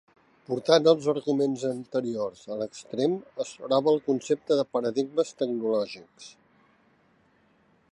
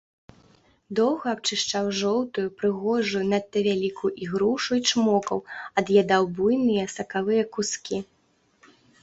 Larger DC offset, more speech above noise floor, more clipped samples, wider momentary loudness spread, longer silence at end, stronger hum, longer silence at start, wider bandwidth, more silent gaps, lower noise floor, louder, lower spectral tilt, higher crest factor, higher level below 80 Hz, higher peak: neither; about the same, 38 dB vs 41 dB; neither; first, 13 LU vs 8 LU; first, 1.6 s vs 1 s; neither; second, 0.5 s vs 0.9 s; first, 11 kHz vs 8 kHz; neither; about the same, -64 dBFS vs -65 dBFS; about the same, -27 LUFS vs -25 LUFS; first, -5.5 dB/octave vs -4 dB/octave; about the same, 22 dB vs 18 dB; second, -76 dBFS vs -64 dBFS; about the same, -6 dBFS vs -6 dBFS